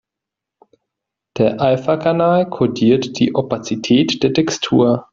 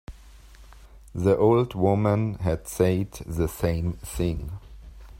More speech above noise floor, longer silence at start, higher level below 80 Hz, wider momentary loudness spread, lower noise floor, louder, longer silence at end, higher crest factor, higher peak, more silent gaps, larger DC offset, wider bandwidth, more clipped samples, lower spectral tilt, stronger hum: first, 68 dB vs 24 dB; first, 1.35 s vs 0.1 s; second, -54 dBFS vs -42 dBFS; second, 5 LU vs 12 LU; first, -84 dBFS vs -48 dBFS; first, -16 LUFS vs -25 LUFS; about the same, 0.1 s vs 0 s; about the same, 14 dB vs 18 dB; first, -2 dBFS vs -6 dBFS; neither; neither; second, 7.6 kHz vs 16 kHz; neither; second, -6 dB/octave vs -7.5 dB/octave; neither